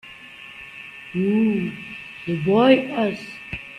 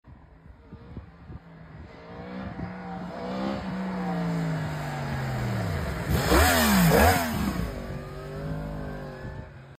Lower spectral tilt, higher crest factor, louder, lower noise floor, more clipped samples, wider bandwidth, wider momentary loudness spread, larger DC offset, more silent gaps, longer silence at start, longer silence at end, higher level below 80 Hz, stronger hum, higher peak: first, -7.5 dB/octave vs -5 dB/octave; about the same, 20 dB vs 20 dB; first, -21 LUFS vs -27 LUFS; second, -41 dBFS vs -50 dBFS; neither; second, 10.5 kHz vs 15.5 kHz; second, 21 LU vs 25 LU; neither; neither; about the same, 0.05 s vs 0.05 s; about the same, 0 s vs 0 s; second, -54 dBFS vs -38 dBFS; neither; first, -2 dBFS vs -8 dBFS